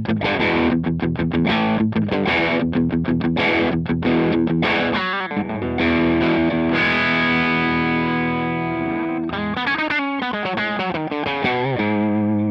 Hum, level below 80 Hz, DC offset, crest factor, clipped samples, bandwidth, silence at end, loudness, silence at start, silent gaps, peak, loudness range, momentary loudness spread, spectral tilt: none; -46 dBFS; under 0.1%; 12 dB; under 0.1%; 6.4 kHz; 0 s; -19 LUFS; 0 s; none; -8 dBFS; 3 LU; 6 LU; -7.5 dB/octave